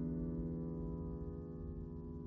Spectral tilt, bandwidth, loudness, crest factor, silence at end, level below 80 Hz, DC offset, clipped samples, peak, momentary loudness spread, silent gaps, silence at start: -13 dB/octave; 2.1 kHz; -45 LUFS; 12 dB; 0 s; -50 dBFS; under 0.1%; under 0.1%; -32 dBFS; 6 LU; none; 0 s